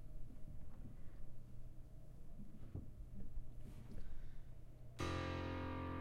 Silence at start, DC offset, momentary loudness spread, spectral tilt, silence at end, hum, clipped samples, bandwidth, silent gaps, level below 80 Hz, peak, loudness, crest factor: 0 s; under 0.1%; 16 LU; -6.5 dB/octave; 0 s; none; under 0.1%; 9.6 kHz; none; -52 dBFS; -30 dBFS; -52 LUFS; 16 dB